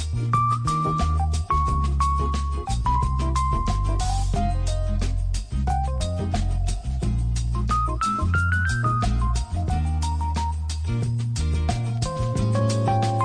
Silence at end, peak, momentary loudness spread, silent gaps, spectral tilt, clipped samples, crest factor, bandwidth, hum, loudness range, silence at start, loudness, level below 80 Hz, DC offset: 0 s; -10 dBFS; 5 LU; none; -6 dB/octave; under 0.1%; 14 dB; 10.5 kHz; none; 2 LU; 0 s; -24 LUFS; -26 dBFS; under 0.1%